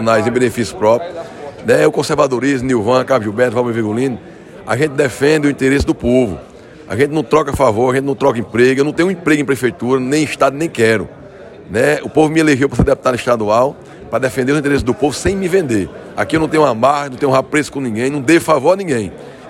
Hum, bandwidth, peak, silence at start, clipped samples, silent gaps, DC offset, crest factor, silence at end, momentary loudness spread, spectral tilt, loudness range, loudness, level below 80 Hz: none; 16 kHz; 0 dBFS; 0 s; under 0.1%; none; under 0.1%; 14 dB; 0 s; 8 LU; -5.5 dB/octave; 1 LU; -14 LUFS; -38 dBFS